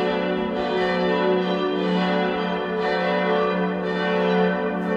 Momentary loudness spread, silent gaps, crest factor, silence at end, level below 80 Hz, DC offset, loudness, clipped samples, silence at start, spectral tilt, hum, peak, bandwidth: 4 LU; none; 14 dB; 0 s; -54 dBFS; under 0.1%; -22 LUFS; under 0.1%; 0 s; -7.5 dB/octave; none; -8 dBFS; 7.6 kHz